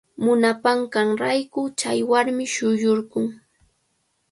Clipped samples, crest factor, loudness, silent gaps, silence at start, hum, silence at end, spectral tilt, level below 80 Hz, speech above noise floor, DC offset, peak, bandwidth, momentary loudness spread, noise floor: under 0.1%; 18 dB; -21 LUFS; none; 0.2 s; none; 0.95 s; -4 dB/octave; -68 dBFS; 49 dB; under 0.1%; -4 dBFS; 11.5 kHz; 8 LU; -70 dBFS